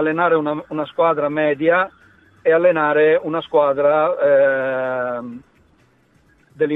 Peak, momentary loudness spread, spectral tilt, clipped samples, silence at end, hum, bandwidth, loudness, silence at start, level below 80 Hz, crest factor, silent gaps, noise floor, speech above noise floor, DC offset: -4 dBFS; 10 LU; -8.5 dB/octave; under 0.1%; 0 s; none; 4 kHz; -17 LUFS; 0 s; -64 dBFS; 14 dB; none; -56 dBFS; 39 dB; under 0.1%